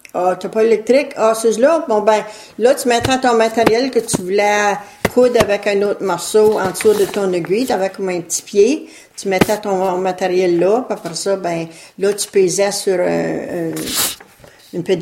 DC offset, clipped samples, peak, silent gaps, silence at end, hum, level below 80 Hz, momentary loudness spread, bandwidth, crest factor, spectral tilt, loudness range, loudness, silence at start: under 0.1%; under 0.1%; 0 dBFS; none; 0 s; none; -48 dBFS; 8 LU; 16.5 kHz; 16 dB; -4 dB/octave; 3 LU; -16 LUFS; 0.15 s